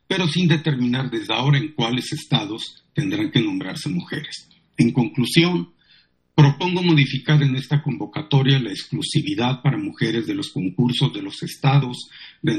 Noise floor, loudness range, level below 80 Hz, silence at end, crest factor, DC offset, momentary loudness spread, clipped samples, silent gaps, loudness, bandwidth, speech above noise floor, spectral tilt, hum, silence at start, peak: -57 dBFS; 4 LU; -60 dBFS; 0 s; 20 dB; under 0.1%; 12 LU; under 0.1%; none; -21 LUFS; 12.5 kHz; 37 dB; -6 dB/octave; none; 0.1 s; -2 dBFS